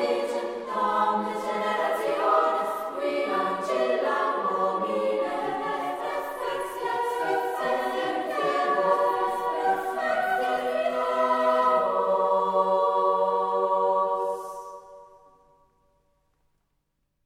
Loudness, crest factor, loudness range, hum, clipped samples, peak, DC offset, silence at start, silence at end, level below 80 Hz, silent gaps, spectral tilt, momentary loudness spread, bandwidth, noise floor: -26 LUFS; 18 dB; 5 LU; none; under 0.1%; -8 dBFS; under 0.1%; 0 s; 2.2 s; -68 dBFS; none; -4 dB/octave; 7 LU; 16 kHz; -75 dBFS